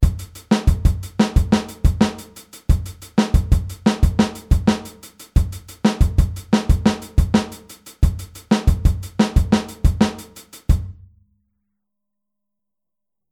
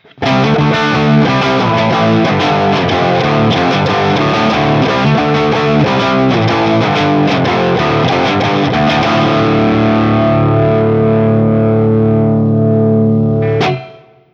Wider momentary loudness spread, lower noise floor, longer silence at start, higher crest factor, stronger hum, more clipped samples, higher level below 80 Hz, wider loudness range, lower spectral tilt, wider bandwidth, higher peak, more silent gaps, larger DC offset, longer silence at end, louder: first, 15 LU vs 1 LU; first, -87 dBFS vs -36 dBFS; second, 0 s vs 0.2 s; first, 18 dB vs 10 dB; neither; neither; first, -22 dBFS vs -38 dBFS; about the same, 3 LU vs 1 LU; about the same, -6.5 dB/octave vs -7 dB/octave; first, 16 kHz vs 7.4 kHz; about the same, -2 dBFS vs 0 dBFS; neither; neither; first, 2.4 s vs 0.4 s; second, -20 LUFS vs -11 LUFS